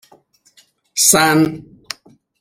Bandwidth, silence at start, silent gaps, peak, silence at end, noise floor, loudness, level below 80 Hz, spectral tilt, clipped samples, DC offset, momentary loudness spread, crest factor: 16.5 kHz; 0.95 s; none; 0 dBFS; 0.8 s; -54 dBFS; -13 LUFS; -54 dBFS; -2.5 dB/octave; under 0.1%; under 0.1%; 21 LU; 18 dB